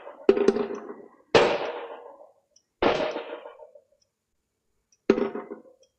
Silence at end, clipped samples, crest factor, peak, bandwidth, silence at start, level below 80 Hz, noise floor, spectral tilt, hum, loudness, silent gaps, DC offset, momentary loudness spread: 0.4 s; under 0.1%; 24 dB; -4 dBFS; 9.2 kHz; 0 s; -58 dBFS; -78 dBFS; -5 dB/octave; none; -25 LUFS; none; under 0.1%; 22 LU